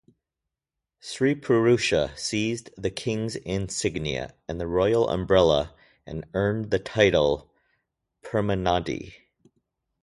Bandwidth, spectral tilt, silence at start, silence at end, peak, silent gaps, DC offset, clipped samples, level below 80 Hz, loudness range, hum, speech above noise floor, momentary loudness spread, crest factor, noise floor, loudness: 11.5 kHz; -5 dB/octave; 1.05 s; 0.9 s; -4 dBFS; none; under 0.1%; under 0.1%; -46 dBFS; 3 LU; none; 63 dB; 14 LU; 22 dB; -87 dBFS; -25 LUFS